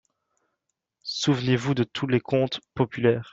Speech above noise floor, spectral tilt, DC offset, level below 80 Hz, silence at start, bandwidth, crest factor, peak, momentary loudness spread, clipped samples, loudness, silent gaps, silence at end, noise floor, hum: 57 dB; -6 dB/octave; under 0.1%; -60 dBFS; 1.05 s; 7.8 kHz; 18 dB; -8 dBFS; 6 LU; under 0.1%; -25 LUFS; none; 0 s; -81 dBFS; none